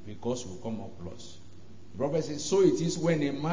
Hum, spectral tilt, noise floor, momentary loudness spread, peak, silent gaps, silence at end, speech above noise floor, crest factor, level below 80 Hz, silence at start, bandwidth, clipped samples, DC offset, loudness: none; -5.5 dB/octave; -52 dBFS; 20 LU; -12 dBFS; none; 0 s; 23 dB; 18 dB; -58 dBFS; 0 s; 7.6 kHz; under 0.1%; 0.8%; -29 LUFS